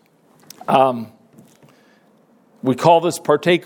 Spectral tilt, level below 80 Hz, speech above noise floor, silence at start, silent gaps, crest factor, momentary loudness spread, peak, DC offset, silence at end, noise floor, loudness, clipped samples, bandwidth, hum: -5.5 dB/octave; -68 dBFS; 39 dB; 0.7 s; none; 20 dB; 17 LU; 0 dBFS; under 0.1%; 0.05 s; -55 dBFS; -17 LUFS; under 0.1%; 17.5 kHz; none